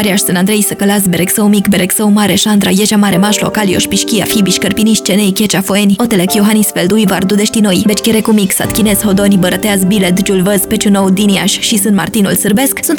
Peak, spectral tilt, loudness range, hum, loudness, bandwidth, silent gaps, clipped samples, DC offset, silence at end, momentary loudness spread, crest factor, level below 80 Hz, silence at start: 0 dBFS; -4 dB/octave; 1 LU; none; -10 LUFS; over 20 kHz; none; under 0.1%; 0.1%; 0 s; 2 LU; 10 dB; -38 dBFS; 0 s